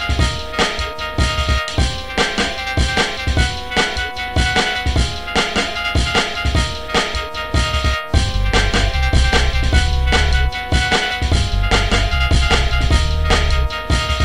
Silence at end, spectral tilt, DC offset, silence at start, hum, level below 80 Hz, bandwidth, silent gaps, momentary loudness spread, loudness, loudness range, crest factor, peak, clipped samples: 0 s; -4 dB/octave; 2%; 0 s; none; -20 dBFS; 13.5 kHz; none; 4 LU; -17 LUFS; 2 LU; 16 dB; 0 dBFS; under 0.1%